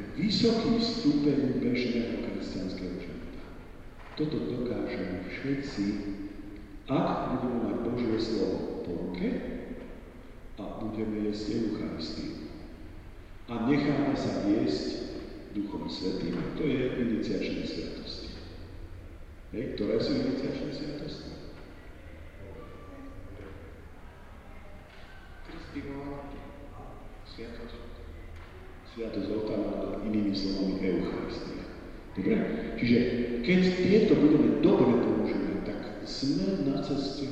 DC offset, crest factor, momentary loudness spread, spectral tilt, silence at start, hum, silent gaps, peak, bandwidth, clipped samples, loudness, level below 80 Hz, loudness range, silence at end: under 0.1%; 22 dB; 23 LU; -7 dB/octave; 0 s; none; none; -10 dBFS; 8.6 kHz; under 0.1%; -30 LUFS; -48 dBFS; 19 LU; 0 s